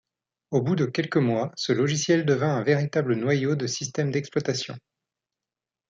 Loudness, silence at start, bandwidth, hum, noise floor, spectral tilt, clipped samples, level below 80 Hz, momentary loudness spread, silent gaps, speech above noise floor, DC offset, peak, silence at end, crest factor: -25 LUFS; 0.5 s; 7.8 kHz; none; -90 dBFS; -5.5 dB/octave; under 0.1%; -68 dBFS; 6 LU; none; 66 dB; under 0.1%; -8 dBFS; 1.1 s; 18 dB